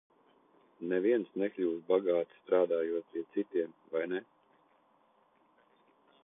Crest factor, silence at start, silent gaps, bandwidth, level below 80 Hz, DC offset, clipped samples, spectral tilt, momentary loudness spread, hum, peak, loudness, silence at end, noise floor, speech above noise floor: 20 dB; 0.8 s; none; 3.8 kHz; -84 dBFS; under 0.1%; under 0.1%; -9.5 dB/octave; 8 LU; none; -16 dBFS; -33 LUFS; 2.05 s; -69 dBFS; 37 dB